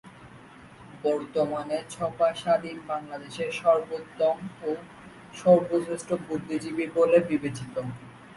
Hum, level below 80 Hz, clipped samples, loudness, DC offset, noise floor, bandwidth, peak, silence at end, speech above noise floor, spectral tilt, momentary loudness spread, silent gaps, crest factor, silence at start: none; -64 dBFS; under 0.1%; -27 LUFS; under 0.1%; -49 dBFS; 11.5 kHz; -6 dBFS; 0.05 s; 23 dB; -6 dB/octave; 15 LU; none; 20 dB; 0.05 s